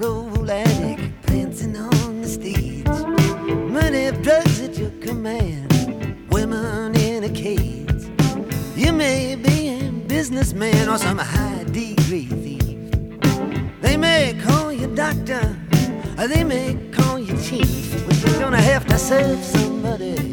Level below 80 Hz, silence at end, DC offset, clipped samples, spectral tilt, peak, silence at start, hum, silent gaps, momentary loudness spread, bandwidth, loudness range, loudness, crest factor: -30 dBFS; 0 s; under 0.1%; under 0.1%; -5.5 dB/octave; 0 dBFS; 0 s; none; none; 8 LU; 19.5 kHz; 3 LU; -20 LUFS; 18 dB